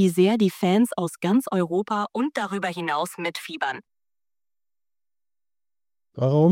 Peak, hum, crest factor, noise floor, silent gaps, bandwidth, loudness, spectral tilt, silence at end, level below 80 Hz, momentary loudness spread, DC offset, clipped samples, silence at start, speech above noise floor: -8 dBFS; none; 16 dB; under -90 dBFS; none; 16.5 kHz; -24 LUFS; -6.5 dB/octave; 0 s; -72 dBFS; 9 LU; under 0.1%; under 0.1%; 0 s; over 68 dB